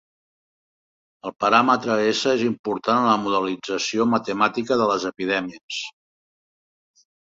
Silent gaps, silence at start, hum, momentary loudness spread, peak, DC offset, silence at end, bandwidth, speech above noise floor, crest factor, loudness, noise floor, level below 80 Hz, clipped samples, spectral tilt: 2.59-2.64 s, 5.63-5.69 s; 1.25 s; none; 12 LU; -2 dBFS; under 0.1%; 1.35 s; 7.8 kHz; over 69 dB; 20 dB; -21 LUFS; under -90 dBFS; -64 dBFS; under 0.1%; -4 dB/octave